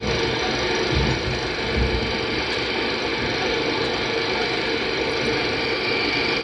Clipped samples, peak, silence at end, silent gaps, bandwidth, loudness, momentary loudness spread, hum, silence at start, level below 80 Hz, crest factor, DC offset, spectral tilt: under 0.1%; -8 dBFS; 0 s; none; 11 kHz; -22 LUFS; 2 LU; none; 0 s; -36 dBFS; 14 dB; under 0.1%; -4.5 dB/octave